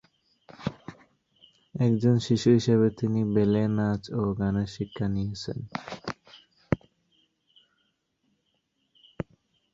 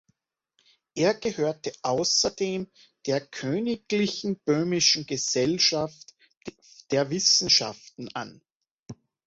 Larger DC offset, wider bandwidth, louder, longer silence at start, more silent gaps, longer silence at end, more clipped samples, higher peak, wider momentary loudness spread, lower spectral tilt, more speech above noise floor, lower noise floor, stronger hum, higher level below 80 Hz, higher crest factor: neither; about the same, 7.8 kHz vs 8 kHz; second, -27 LUFS vs -24 LUFS; second, 0.6 s vs 0.95 s; second, none vs 6.37-6.41 s, 8.55-8.61 s, 8.71-8.86 s; first, 0.5 s vs 0.35 s; neither; about the same, -6 dBFS vs -8 dBFS; about the same, 18 LU vs 18 LU; first, -7.5 dB/octave vs -3 dB/octave; about the same, 50 dB vs 47 dB; about the same, -75 dBFS vs -73 dBFS; neither; first, -54 dBFS vs -64 dBFS; about the same, 22 dB vs 20 dB